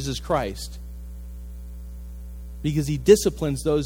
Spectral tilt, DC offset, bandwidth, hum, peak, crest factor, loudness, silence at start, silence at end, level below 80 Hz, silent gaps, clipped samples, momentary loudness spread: -5.5 dB/octave; under 0.1%; 17 kHz; 60 Hz at -35 dBFS; -2 dBFS; 22 dB; -22 LUFS; 0 s; 0 s; -36 dBFS; none; under 0.1%; 22 LU